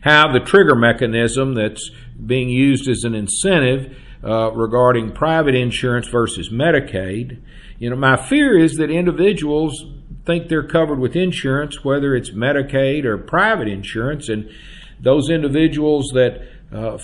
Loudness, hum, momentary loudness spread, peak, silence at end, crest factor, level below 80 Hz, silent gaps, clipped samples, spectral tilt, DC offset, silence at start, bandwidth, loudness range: -17 LUFS; none; 13 LU; 0 dBFS; 0 s; 16 dB; -38 dBFS; none; under 0.1%; -5.5 dB/octave; under 0.1%; 0 s; 11.5 kHz; 2 LU